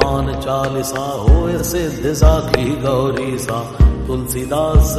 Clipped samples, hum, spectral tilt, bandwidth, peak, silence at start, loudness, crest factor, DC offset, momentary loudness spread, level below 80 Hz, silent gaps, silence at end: under 0.1%; none; -6 dB/octave; 13.5 kHz; 0 dBFS; 0 s; -17 LUFS; 14 dB; under 0.1%; 7 LU; -18 dBFS; none; 0 s